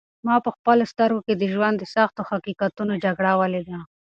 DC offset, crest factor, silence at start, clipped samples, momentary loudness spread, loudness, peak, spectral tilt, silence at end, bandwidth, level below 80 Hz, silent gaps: under 0.1%; 18 dB; 0.25 s; under 0.1%; 9 LU; -22 LUFS; -4 dBFS; -7.5 dB/octave; 0.25 s; 7.6 kHz; -64 dBFS; 0.59-0.65 s